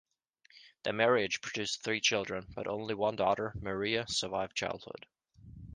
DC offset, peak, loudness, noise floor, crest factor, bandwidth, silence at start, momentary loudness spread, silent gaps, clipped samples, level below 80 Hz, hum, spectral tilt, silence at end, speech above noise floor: under 0.1%; -12 dBFS; -33 LUFS; -67 dBFS; 22 dB; 10.5 kHz; 0.55 s; 11 LU; none; under 0.1%; -60 dBFS; none; -3 dB/octave; 0 s; 34 dB